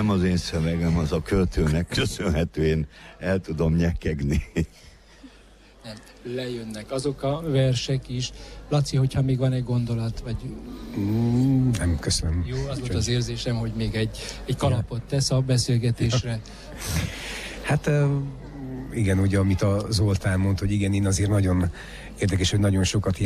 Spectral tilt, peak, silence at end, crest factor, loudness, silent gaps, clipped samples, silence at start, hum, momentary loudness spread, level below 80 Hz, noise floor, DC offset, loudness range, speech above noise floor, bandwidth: -6 dB/octave; -12 dBFS; 0 s; 12 dB; -25 LUFS; none; under 0.1%; 0 s; none; 12 LU; -38 dBFS; -51 dBFS; under 0.1%; 5 LU; 27 dB; 14 kHz